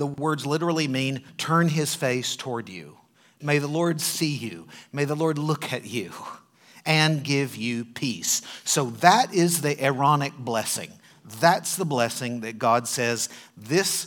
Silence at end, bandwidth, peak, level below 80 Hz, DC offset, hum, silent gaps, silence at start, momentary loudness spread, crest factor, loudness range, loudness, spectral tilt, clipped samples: 0 s; 19 kHz; 0 dBFS; -74 dBFS; under 0.1%; none; none; 0 s; 13 LU; 24 dB; 5 LU; -24 LUFS; -4 dB/octave; under 0.1%